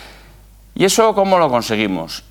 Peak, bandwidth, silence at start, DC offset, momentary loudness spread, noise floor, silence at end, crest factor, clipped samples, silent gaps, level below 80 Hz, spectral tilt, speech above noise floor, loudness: 0 dBFS; 19 kHz; 0 s; under 0.1%; 9 LU; -43 dBFS; 0.1 s; 16 dB; under 0.1%; none; -46 dBFS; -4 dB/octave; 28 dB; -15 LUFS